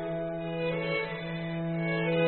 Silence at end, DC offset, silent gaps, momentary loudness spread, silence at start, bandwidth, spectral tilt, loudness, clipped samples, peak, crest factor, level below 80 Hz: 0 s; 0.1%; none; 5 LU; 0 s; 4.3 kHz; -5 dB/octave; -32 LUFS; under 0.1%; -16 dBFS; 16 dB; -58 dBFS